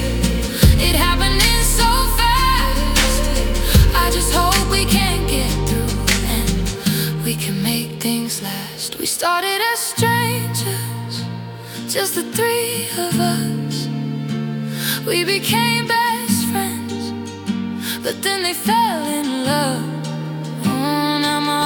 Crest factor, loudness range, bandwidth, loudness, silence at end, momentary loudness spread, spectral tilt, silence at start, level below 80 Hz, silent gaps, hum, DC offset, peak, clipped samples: 18 dB; 5 LU; 19 kHz; -18 LUFS; 0 s; 10 LU; -4 dB/octave; 0 s; -24 dBFS; none; none; under 0.1%; 0 dBFS; under 0.1%